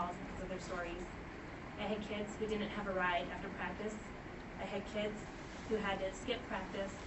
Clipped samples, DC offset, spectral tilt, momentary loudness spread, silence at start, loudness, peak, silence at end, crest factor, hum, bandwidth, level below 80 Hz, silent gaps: under 0.1%; under 0.1%; -5 dB/octave; 11 LU; 0 s; -42 LUFS; -24 dBFS; 0 s; 18 dB; none; 8.2 kHz; -56 dBFS; none